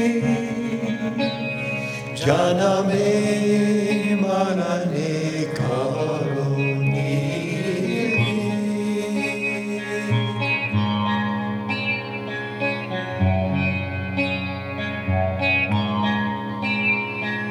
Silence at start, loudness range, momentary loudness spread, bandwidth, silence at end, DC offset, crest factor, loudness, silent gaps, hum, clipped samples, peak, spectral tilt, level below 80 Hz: 0 s; 3 LU; 7 LU; 13 kHz; 0 s; under 0.1%; 20 dB; -22 LUFS; none; none; under 0.1%; -2 dBFS; -6 dB/octave; -54 dBFS